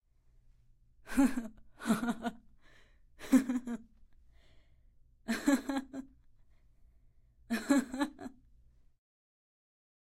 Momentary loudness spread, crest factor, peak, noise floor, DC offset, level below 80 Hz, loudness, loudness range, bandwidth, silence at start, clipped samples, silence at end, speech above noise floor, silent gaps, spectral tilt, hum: 19 LU; 24 dB; -14 dBFS; -65 dBFS; under 0.1%; -60 dBFS; -34 LUFS; 5 LU; 16 kHz; 1.05 s; under 0.1%; 1.7 s; 34 dB; none; -4.5 dB/octave; none